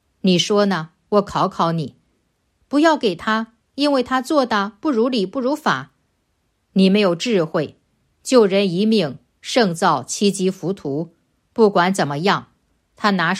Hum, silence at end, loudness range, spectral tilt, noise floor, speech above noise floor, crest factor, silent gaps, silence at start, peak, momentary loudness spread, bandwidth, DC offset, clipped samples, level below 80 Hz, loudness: none; 0 s; 2 LU; -5 dB/octave; -68 dBFS; 50 dB; 18 dB; none; 0.25 s; -2 dBFS; 10 LU; 13.5 kHz; under 0.1%; under 0.1%; -60 dBFS; -19 LUFS